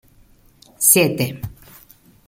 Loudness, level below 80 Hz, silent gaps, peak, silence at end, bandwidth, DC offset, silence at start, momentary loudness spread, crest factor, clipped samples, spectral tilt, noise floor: -15 LUFS; -52 dBFS; none; 0 dBFS; 0.75 s; 17 kHz; under 0.1%; 0.8 s; 21 LU; 22 dB; under 0.1%; -3 dB/octave; -52 dBFS